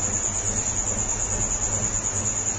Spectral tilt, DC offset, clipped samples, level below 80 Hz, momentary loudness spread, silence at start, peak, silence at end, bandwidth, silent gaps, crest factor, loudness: -2.5 dB/octave; under 0.1%; under 0.1%; -36 dBFS; 1 LU; 0 s; -12 dBFS; 0 s; 9.4 kHz; none; 14 dB; -23 LUFS